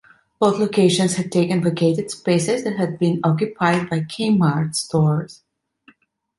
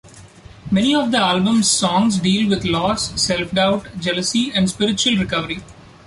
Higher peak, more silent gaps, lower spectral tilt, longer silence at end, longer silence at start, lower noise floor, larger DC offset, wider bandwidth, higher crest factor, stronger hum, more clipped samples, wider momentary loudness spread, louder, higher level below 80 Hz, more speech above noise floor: about the same, -2 dBFS vs -4 dBFS; neither; first, -6 dB/octave vs -4 dB/octave; first, 1.05 s vs 0.35 s; first, 0.4 s vs 0.05 s; first, -55 dBFS vs -42 dBFS; neither; about the same, 11.5 kHz vs 11.5 kHz; about the same, 18 dB vs 16 dB; neither; neither; about the same, 6 LU vs 6 LU; about the same, -19 LUFS vs -17 LUFS; second, -58 dBFS vs -44 dBFS; first, 37 dB vs 24 dB